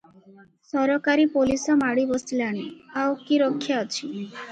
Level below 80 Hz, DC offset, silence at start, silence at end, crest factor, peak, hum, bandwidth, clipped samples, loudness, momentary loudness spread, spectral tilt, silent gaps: -58 dBFS; under 0.1%; 0.75 s; 0 s; 14 dB; -10 dBFS; none; 9.2 kHz; under 0.1%; -24 LUFS; 11 LU; -4 dB/octave; none